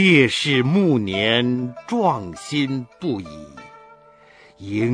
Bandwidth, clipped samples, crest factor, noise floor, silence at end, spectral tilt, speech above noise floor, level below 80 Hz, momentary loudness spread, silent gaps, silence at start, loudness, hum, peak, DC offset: 10.5 kHz; under 0.1%; 18 dB; -50 dBFS; 0 s; -5.5 dB/octave; 30 dB; -58 dBFS; 15 LU; none; 0 s; -20 LUFS; none; -2 dBFS; under 0.1%